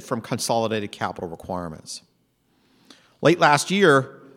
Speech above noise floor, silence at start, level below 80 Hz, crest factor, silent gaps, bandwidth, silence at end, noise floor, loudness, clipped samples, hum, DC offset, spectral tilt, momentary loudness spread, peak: 44 dB; 0 s; -60 dBFS; 20 dB; none; 16.5 kHz; 0.2 s; -66 dBFS; -21 LUFS; under 0.1%; none; under 0.1%; -4.5 dB/octave; 17 LU; -2 dBFS